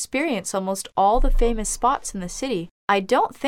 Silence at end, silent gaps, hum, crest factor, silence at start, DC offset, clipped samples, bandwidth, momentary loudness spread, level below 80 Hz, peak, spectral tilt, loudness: 0 s; 2.71-2.88 s; none; 16 dB; 0 s; under 0.1%; under 0.1%; 15 kHz; 8 LU; -26 dBFS; -6 dBFS; -4 dB/octave; -23 LUFS